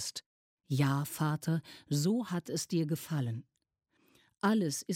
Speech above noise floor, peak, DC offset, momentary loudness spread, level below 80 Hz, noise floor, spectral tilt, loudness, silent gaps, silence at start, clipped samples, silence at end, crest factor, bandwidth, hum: 46 dB; -18 dBFS; under 0.1%; 7 LU; -76 dBFS; -78 dBFS; -5.5 dB/octave; -33 LUFS; 0.26-0.57 s; 0 s; under 0.1%; 0 s; 16 dB; 16.5 kHz; none